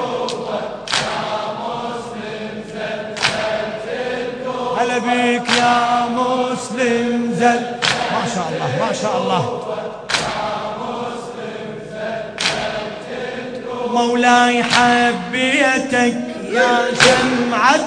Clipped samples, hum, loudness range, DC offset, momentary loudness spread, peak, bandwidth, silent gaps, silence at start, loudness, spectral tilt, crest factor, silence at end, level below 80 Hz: under 0.1%; none; 8 LU; under 0.1%; 14 LU; 0 dBFS; 11 kHz; none; 0 s; -18 LUFS; -3.5 dB/octave; 18 dB; 0 s; -52 dBFS